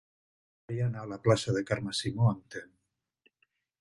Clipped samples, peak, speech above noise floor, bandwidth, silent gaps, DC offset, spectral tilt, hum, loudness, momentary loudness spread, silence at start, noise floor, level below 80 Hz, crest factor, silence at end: under 0.1%; -10 dBFS; 48 dB; 11.5 kHz; none; under 0.1%; -6 dB/octave; none; -31 LUFS; 12 LU; 0.7 s; -78 dBFS; -60 dBFS; 24 dB; 1.15 s